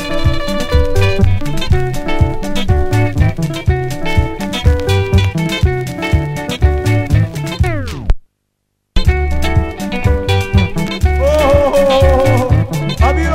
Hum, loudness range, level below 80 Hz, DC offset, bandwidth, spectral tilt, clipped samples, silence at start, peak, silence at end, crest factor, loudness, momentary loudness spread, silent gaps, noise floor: none; 4 LU; -18 dBFS; under 0.1%; 15.5 kHz; -6.5 dB/octave; under 0.1%; 0 s; 0 dBFS; 0 s; 12 dB; -15 LUFS; 8 LU; none; -68 dBFS